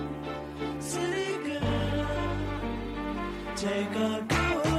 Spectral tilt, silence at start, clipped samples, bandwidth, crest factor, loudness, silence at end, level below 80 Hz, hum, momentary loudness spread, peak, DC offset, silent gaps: -5 dB/octave; 0 s; under 0.1%; 15 kHz; 16 dB; -31 LUFS; 0 s; -42 dBFS; none; 8 LU; -14 dBFS; under 0.1%; none